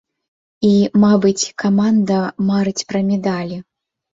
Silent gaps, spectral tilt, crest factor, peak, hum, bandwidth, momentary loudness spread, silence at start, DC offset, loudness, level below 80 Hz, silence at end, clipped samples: none; -6 dB/octave; 14 dB; -2 dBFS; none; 7.8 kHz; 8 LU; 0.6 s; under 0.1%; -16 LUFS; -56 dBFS; 0.5 s; under 0.1%